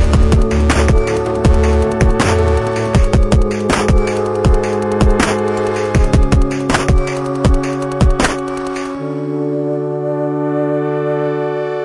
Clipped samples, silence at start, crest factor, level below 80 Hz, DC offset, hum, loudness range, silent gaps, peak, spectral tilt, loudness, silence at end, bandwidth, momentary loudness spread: under 0.1%; 0 s; 14 dB; -18 dBFS; under 0.1%; none; 4 LU; none; 0 dBFS; -6.5 dB/octave; -15 LUFS; 0 s; 11.5 kHz; 6 LU